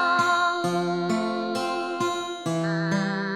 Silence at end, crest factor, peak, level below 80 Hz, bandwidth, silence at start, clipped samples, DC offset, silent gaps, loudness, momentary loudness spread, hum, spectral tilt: 0 s; 16 dB; -10 dBFS; -74 dBFS; 14 kHz; 0 s; under 0.1%; under 0.1%; none; -25 LUFS; 6 LU; none; -5 dB/octave